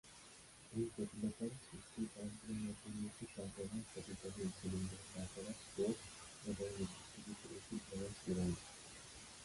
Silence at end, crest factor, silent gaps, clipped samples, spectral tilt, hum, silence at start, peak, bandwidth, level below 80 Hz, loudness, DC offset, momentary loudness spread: 0 s; 18 dB; none; under 0.1%; -5 dB/octave; none; 0.05 s; -28 dBFS; 11.5 kHz; -64 dBFS; -47 LUFS; under 0.1%; 12 LU